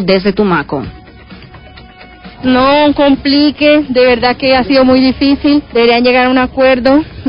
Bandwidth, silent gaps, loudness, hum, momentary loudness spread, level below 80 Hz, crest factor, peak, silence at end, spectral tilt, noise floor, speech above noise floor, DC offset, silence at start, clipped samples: 5.4 kHz; none; -9 LUFS; none; 5 LU; -34 dBFS; 10 dB; 0 dBFS; 0 s; -8.5 dB/octave; -34 dBFS; 25 dB; under 0.1%; 0 s; under 0.1%